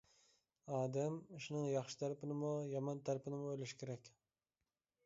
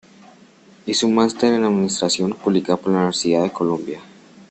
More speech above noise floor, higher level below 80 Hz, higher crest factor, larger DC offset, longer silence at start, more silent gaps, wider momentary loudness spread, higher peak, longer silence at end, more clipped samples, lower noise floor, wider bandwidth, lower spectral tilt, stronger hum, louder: first, over 47 dB vs 30 dB; second, -84 dBFS vs -60 dBFS; about the same, 16 dB vs 16 dB; neither; second, 0.65 s vs 0.85 s; neither; about the same, 8 LU vs 8 LU; second, -28 dBFS vs -4 dBFS; first, 0.95 s vs 0.05 s; neither; first, under -90 dBFS vs -49 dBFS; second, 7.6 kHz vs 8.8 kHz; first, -7 dB/octave vs -4.5 dB/octave; neither; second, -44 LUFS vs -19 LUFS